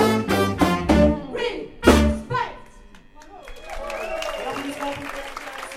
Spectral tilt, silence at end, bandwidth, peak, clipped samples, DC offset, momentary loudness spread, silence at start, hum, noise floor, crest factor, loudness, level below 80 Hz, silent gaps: -5.5 dB/octave; 0 s; 16 kHz; 0 dBFS; under 0.1%; under 0.1%; 16 LU; 0 s; none; -46 dBFS; 22 dB; -22 LUFS; -32 dBFS; none